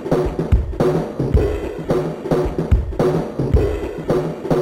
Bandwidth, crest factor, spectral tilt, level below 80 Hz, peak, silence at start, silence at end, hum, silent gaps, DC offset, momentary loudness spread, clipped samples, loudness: 15.5 kHz; 14 dB; -8.5 dB/octave; -24 dBFS; -4 dBFS; 0 s; 0 s; none; none; under 0.1%; 3 LU; under 0.1%; -20 LUFS